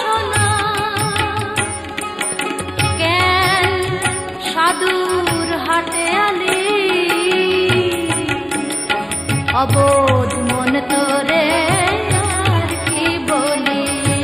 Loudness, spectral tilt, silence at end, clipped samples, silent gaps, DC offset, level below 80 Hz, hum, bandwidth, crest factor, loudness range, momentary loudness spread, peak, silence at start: -16 LUFS; -4 dB/octave; 0 s; under 0.1%; none; under 0.1%; -40 dBFS; none; 15 kHz; 14 dB; 2 LU; 6 LU; -4 dBFS; 0 s